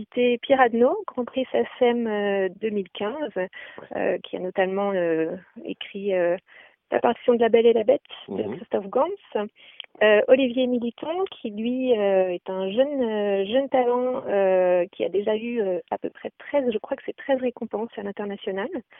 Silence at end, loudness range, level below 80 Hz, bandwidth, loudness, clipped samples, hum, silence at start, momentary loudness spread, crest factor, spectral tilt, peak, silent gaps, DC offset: 0.2 s; 5 LU; -68 dBFS; 3.8 kHz; -24 LUFS; under 0.1%; none; 0 s; 13 LU; 20 dB; -10 dB/octave; -4 dBFS; none; under 0.1%